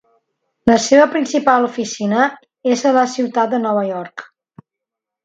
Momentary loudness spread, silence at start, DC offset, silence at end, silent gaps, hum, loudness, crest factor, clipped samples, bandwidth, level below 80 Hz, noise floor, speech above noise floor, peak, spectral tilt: 11 LU; 0.65 s; under 0.1%; 1 s; none; none; -16 LUFS; 16 dB; under 0.1%; 9.2 kHz; -56 dBFS; -83 dBFS; 68 dB; 0 dBFS; -4 dB/octave